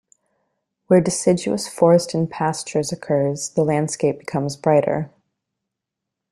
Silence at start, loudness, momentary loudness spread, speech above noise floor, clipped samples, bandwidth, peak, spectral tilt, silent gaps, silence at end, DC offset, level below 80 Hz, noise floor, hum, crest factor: 0.9 s; -20 LUFS; 9 LU; 64 dB; under 0.1%; 13 kHz; -2 dBFS; -5.5 dB/octave; none; 1.25 s; under 0.1%; -60 dBFS; -83 dBFS; none; 18 dB